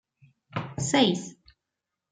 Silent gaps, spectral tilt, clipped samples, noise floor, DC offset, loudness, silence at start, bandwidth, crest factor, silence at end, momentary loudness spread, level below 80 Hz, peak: none; -4 dB/octave; under 0.1%; -86 dBFS; under 0.1%; -26 LUFS; 0.55 s; 9.6 kHz; 22 dB; 0.8 s; 15 LU; -64 dBFS; -8 dBFS